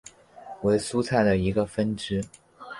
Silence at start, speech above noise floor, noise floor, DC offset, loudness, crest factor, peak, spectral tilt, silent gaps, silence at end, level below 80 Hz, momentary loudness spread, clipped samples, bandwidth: 0.35 s; 20 dB; -45 dBFS; under 0.1%; -25 LUFS; 18 dB; -8 dBFS; -6 dB/octave; none; 0 s; -48 dBFS; 9 LU; under 0.1%; 11.5 kHz